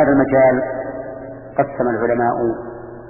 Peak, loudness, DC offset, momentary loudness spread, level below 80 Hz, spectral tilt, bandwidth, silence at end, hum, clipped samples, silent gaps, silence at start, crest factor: -2 dBFS; -18 LUFS; under 0.1%; 17 LU; -46 dBFS; -12.5 dB/octave; 2.9 kHz; 0 s; none; under 0.1%; none; 0 s; 16 dB